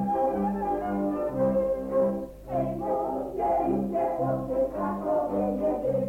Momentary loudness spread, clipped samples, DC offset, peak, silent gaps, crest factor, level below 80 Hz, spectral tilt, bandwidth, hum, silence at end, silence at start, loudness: 4 LU; under 0.1%; under 0.1%; -16 dBFS; none; 12 dB; -48 dBFS; -9.5 dB/octave; 16.5 kHz; 50 Hz at -50 dBFS; 0 s; 0 s; -28 LUFS